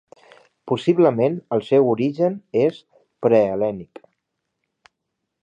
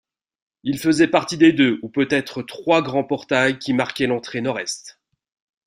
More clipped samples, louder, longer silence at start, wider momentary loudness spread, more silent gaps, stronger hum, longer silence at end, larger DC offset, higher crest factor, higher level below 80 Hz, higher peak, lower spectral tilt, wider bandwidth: neither; about the same, -20 LUFS vs -20 LUFS; about the same, 0.65 s vs 0.65 s; second, 8 LU vs 12 LU; neither; neither; first, 1.6 s vs 0.75 s; neither; about the same, 18 dB vs 18 dB; about the same, -64 dBFS vs -60 dBFS; about the same, -4 dBFS vs -2 dBFS; first, -8.5 dB/octave vs -5 dB/octave; second, 9.2 kHz vs 15.5 kHz